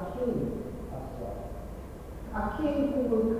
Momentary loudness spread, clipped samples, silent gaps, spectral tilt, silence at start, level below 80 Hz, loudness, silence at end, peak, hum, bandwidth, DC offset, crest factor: 15 LU; under 0.1%; none; -8 dB/octave; 0 s; -44 dBFS; -33 LUFS; 0 s; -16 dBFS; none; 16 kHz; under 0.1%; 16 dB